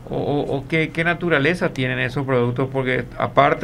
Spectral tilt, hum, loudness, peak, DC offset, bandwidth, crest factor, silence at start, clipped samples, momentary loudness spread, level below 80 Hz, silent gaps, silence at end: -7 dB/octave; none; -20 LUFS; 0 dBFS; under 0.1%; 12 kHz; 20 dB; 0 s; under 0.1%; 5 LU; -44 dBFS; none; 0 s